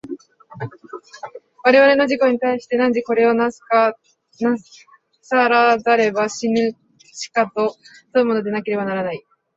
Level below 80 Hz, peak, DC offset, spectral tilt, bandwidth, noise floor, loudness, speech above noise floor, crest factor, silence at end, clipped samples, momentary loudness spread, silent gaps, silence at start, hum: -64 dBFS; -2 dBFS; under 0.1%; -5 dB/octave; 8 kHz; -38 dBFS; -18 LUFS; 21 dB; 18 dB; 0.4 s; under 0.1%; 20 LU; none; 0.05 s; none